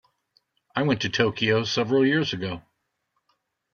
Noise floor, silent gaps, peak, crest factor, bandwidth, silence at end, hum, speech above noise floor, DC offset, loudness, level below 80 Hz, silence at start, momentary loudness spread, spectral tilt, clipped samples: -76 dBFS; none; -6 dBFS; 20 dB; 7 kHz; 1.15 s; none; 53 dB; under 0.1%; -24 LUFS; -62 dBFS; 0.75 s; 12 LU; -5.5 dB/octave; under 0.1%